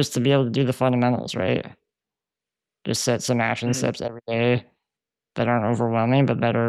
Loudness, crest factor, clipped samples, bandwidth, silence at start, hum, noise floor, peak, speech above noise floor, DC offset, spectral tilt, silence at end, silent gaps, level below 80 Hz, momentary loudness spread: -22 LUFS; 16 dB; under 0.1%; 14 kHz; 0 s; none; -89 dBFS; -8 dBFS; 67 dB; under 0.1%; -5.5 dB/octave; 0 s; none; -62 dBFS; 8 LU